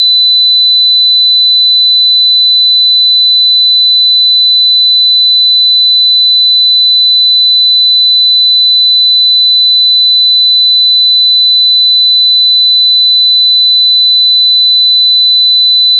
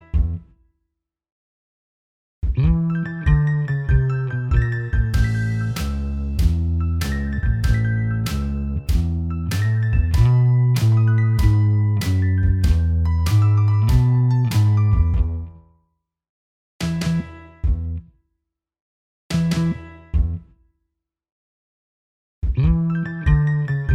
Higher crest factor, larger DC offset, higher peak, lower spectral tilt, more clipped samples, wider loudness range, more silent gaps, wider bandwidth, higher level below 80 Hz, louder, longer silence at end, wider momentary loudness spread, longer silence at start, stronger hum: second, 4 dB vs 16 dB; first, 1% vs under 0.1%; about the same, -2 dBFS vs -4 dBFS; second, 5 dB/octave vs -7 dB/octave; neither; second, 0 LU vs 9 LU; second, none vs 1.32-2.42 s, 16.29-16.80 s, 18.81-19.30 s, 21.32-22.42 s; second, 4.3 kHz vs 15.5 kHz; second, under -90 dBFS vs -26 dBFS; first, -3 LUFS vs -20 LUFS; about the same, 0 s vs 0 s; second, 0 LU vs 9 LU; second, 0 s vs 0.15 s; neither